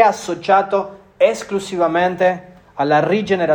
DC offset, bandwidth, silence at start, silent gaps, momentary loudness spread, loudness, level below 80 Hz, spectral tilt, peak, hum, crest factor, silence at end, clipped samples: under 0.1%; 18 kHz; 0 s; none; 8 LU; -17 LUFS; -56 dBFS; -5 dB/octave; 0 dBFS; none; 16 dB; 0 s; under 0.1%